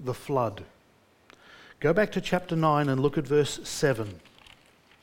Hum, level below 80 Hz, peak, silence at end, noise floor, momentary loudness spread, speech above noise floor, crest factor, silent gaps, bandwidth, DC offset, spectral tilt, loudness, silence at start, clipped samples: none; -54 dBFS; -10 dBFS; 0.85 s; -62 dBFS; 8 LU; 35 dB; 20 dB; none; 17 kHz; under 0.1%; -5.5 dB/octave; -27 LUFS; 0 s; under 0.1%